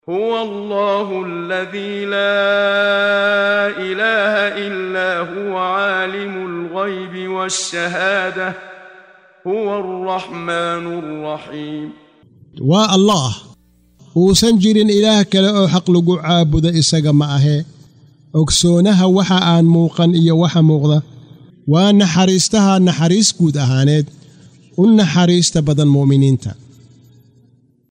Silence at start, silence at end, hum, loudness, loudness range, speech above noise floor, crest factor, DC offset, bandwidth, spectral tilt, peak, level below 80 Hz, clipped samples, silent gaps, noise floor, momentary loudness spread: 0.1 s; 1.4 s; none; -14 LUFS; 8 LU; 39 dB; 12 dB; under 0.1%; 15.5 kHz; -5 dB/octave; -2 dBFS; -42 dBFS; under 0.1%; none; -53 dBFS; 12 LU